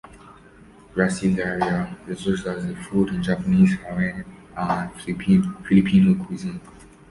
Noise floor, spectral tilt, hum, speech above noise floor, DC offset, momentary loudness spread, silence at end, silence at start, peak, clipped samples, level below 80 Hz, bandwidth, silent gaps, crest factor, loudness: -48 dBFS; -7 dB/octave; none; 27 dB; under 0.1%; 14 LU; 0.4 s; 0.15 s; -4 dBFS; under 0.1%; -48 dBFS; 11.5 kHz; none; 18 dB; -22 LUFS